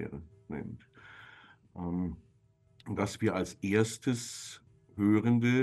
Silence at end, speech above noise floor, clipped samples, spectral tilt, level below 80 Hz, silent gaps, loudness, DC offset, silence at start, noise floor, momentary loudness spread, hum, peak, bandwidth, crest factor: 0 s; 37 dB; under 0.1%; -6 dB/octave; -60 dBFS; none; -32 LUFS; under 0.1%; 0 s; -66 dBFS; 25 LU; none; -14 dBFS; 12.5 kHz; 20 dB